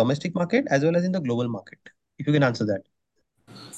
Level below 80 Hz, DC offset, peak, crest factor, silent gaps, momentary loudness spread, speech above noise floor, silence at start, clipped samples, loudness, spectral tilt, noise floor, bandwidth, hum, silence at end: -66 dBFS; under 0.1%; -8 dBFS; 16 dB; none; 10 LU; 50 dB; 0 s; under 0.1%; -24 LUFS; -7 dB/octave; -74 dBFS; 12 kHz; none; 0 s